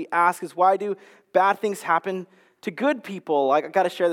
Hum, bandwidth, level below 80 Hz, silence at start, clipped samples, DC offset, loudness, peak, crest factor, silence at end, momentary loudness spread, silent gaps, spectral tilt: none; 16.5 kHz; -90 dBFS; 0 s; under 0.1%; under 0.1%; -23 LUFS; -6 dBFS; 18 dB; 0 s; 12 LU; none; -5 dB/octave